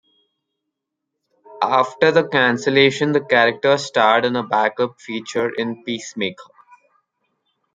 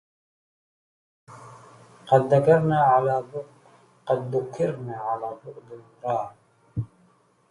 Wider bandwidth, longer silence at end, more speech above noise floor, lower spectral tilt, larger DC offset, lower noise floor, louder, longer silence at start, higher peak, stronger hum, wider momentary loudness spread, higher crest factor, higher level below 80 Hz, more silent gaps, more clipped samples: second, 9.4 kHz vs 11.5 kHz; first, 1.3 s vs 0.65 s; first, 62 dB vs 38 dB; second, -4.5 dB/octave vs -8 dB/octave; neither; first, -80 dBFS vs -61 dBFS; first, -18 LUFS vs -24 LUFS; first, 1.5 s vs 1.3 s; first, 0 dBFS vs -6 dBFS; neither; second, 11 LU vs 22 LU; about the same, 20 dB vs 20 dB; second, -66 dBFS vs -60 dBFS; neither; neither